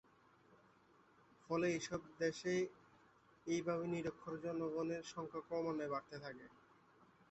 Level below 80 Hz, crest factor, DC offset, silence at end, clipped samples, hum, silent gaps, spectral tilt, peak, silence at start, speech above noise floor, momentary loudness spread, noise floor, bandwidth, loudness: -78 dBFS; 18 dB; under 0.1%; 0.75 s; under 0.1%; none; none; -5.5 dB/octave; -26 dBFS; 1.5 s; 28 dB; 12 LU; -70 dBFS; 8.2 kHz; -43 LUFS